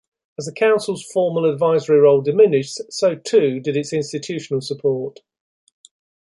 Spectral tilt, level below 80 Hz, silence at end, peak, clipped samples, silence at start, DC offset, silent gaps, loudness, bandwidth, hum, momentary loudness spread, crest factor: -5.5 dB/octave; -68 dBFS; 1.25 s; -2 dBFS; under 0.1%; 0.4 s; under 0.1%; none; -18 LUFS; 11.5 kHz; none; 13 LU; 16 dB